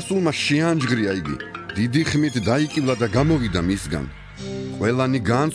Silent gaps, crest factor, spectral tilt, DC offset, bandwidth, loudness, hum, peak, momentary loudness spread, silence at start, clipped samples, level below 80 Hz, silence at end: none; 14 dB; -6 dB/octave; under 0.1%; 11 kHz; -21 LUFS; none; -6 dBFS; 11 LU; 0 s; under 0.1%; -42 dBFS; 0 s